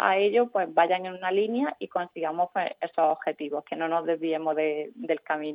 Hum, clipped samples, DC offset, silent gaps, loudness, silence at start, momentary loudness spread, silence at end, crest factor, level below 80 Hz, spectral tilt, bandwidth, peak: none; under 0.1%; under 0.1%; none; -27 LUFS; 0 s; 8 LU; 0 s; 20 dB; -88 dBFS; -8 dB/octave; 5.2 kHz; -8 dBFS